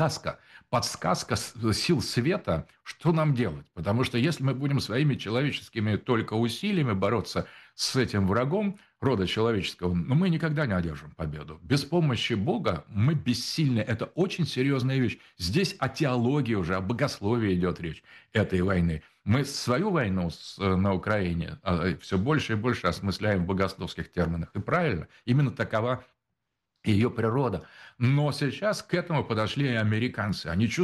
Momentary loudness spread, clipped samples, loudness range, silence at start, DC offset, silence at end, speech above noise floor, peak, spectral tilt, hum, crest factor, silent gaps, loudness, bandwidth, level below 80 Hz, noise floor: 7 LU; under 0.1%; 1 LU; 0 s; under 0.1%; 0 s; 56 dB; -12 dBFS; -6 dB/octave; none; 14 dB; none; -28 LUFS; 12.5 kHz; -52 dBFS; -83 dBFS